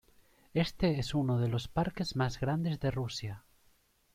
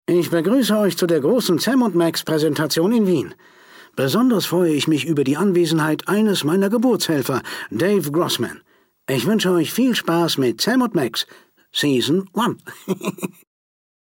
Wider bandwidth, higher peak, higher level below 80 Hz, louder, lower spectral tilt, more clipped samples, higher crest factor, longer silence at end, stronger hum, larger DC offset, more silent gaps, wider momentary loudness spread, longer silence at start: about the same, 15.5 kHz vs 17 kHz; second, -16 dBFS vs -8 dBFS; first, -52 dBFS vs -66 dBFS; second, -33 LUFS vs -19 LUFS; first, -6.5 dB/octave vs -5 dB/octave; neither; first, 18 dB vs 12 dB; about the same, 0.75 s vs 0.75 s; neither; neither; neither; about the same, 7 LU vs 9 LU; first, 0.55 s vs 0.1 s